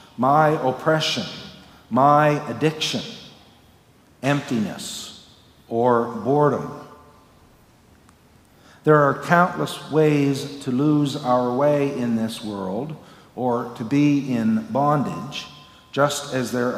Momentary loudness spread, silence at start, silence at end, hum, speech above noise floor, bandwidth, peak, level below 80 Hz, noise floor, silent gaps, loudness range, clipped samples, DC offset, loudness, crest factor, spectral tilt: 15 LU; 0.2 s; 0 s; none; 33 dB; 16 kHz; -2 dBFS; -62 dBFS; -54 dBFS; none; 5 LU; under 0.1%; under 0.1%; -21 LUFS; 20 dB; -6 dB/octave